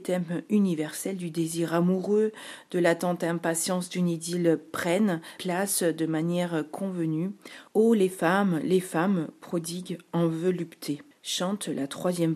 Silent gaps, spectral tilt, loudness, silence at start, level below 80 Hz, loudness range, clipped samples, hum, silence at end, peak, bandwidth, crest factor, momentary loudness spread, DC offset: none; -5.5 dB/octave; -27 LUFS; 0 s; -76 dBFS; 2 LU; under 0.1%; none; 0 s; -8 dBFS; 15 kHz; 18 dB; 8 LU; under 0.1%